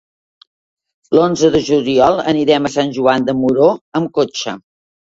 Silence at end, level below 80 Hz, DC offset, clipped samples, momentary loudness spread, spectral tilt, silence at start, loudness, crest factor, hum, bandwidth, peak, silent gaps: 0.55 s; -50 dBFS; under 0.1%; under 0.1%; 7 LU; -5.5 dB/octave; 1.1 s; -14 LUFS; 16 dB; none; 8 kHz; 0 dBFS; 3.81-3.92 s